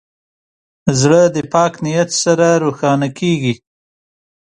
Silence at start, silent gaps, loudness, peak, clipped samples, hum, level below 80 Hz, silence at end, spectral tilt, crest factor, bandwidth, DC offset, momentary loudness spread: 0.85 s; none; -14 LUFS; 0 dBFS; under 0.1%; none; -52 dBFS; 0.95 s; -5 dB/octave; 16 dB; 11 kHz; under 0.1%; 7 LU